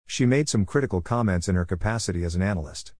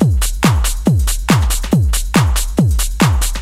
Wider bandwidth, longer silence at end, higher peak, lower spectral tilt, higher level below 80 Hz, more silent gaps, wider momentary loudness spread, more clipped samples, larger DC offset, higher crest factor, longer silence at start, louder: second, 10.5 kHz vs 16.5 kHz; about the same, 0.1 s vs 0 s; second, -8 dBFS vs 0 dBFS; about the same, -5.5 dB/octave vs -5 dB/octave; second, -40 dBFS vs -18 dBFS; neither; first, 5 LU vs 1 LU; neither; first, 0.5% vs under 0.1%; about the same, 16 dB vs 14 dB; about the same, 0.1 s vs 0 s; second, -25 LUFS vs -15 LUFS